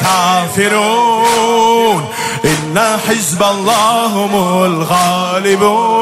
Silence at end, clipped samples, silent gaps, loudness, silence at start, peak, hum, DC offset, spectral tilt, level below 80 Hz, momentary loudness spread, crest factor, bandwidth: 0 s; under 0.1%; none; -11 LUFS; 0 s; 0 dBFS; none; under 0.1%; -3.5 dB/octave; -50 dBFS; 3 LU; 12 dB; 16 kHz